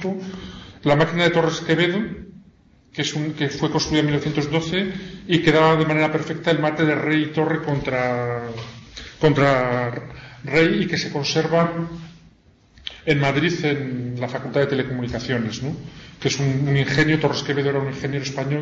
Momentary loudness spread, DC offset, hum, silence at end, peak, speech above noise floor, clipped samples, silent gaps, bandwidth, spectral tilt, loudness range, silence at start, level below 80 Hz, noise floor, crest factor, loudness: 15 LU; under 0.1%; none; 0 s; -4 dBFS; 33 dB; under 0.1%; none; 7.8 kHz; -5.5 dB/octave; 4 LU; 0 s; -48 dBFS; -54 dBFS; 16 dB; -21 LUFS